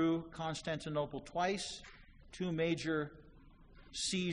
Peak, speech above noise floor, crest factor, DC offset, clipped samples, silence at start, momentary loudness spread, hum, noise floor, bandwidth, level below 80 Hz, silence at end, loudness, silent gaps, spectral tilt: -22 dBFS; 21 dB; 16 dB; under 0.1%; under 0.1%; 0 s; 12 LU; none; -59 dBFS; 10.5 kHz; -62 dBFS; 0 s; -38 LUFS; none; -4.5 dB/octave